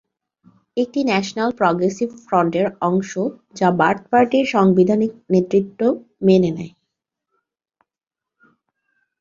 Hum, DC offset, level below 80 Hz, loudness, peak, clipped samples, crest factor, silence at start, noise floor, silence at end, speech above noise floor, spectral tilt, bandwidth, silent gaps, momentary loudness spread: none; under 0.1%; -60 dBFS; -18 LUFS; 0 dBFS; under 0.1%; 18 dB; 0.75 s; -87 dBFS; 2.55 s; 70 dB; -6.5 dB/octave; 7.6 kHz; none; 9 LU